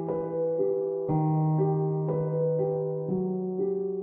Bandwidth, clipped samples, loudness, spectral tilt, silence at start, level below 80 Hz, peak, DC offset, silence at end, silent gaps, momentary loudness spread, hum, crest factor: 2.2 kHz; under 0.1%; -28 LUFS; -15 dB/octave; 0 s; -62 dBFS; -16 dBFS; under 0.1%; 0 s; none; 4 LU; none; 12 dB